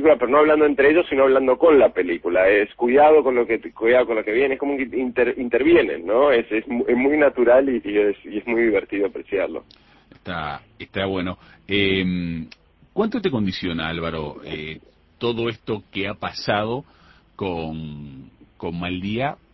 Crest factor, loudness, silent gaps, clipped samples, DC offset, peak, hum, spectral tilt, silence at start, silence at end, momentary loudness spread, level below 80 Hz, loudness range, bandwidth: 16 dB; -20 LUFS; none; under 0.1%; under 0.1%; -4 dBFS; none; -7.5 dB/octave; 0 s; 0.2 s; 16 LU; -48 dBFS; 10 LU; 6 kHz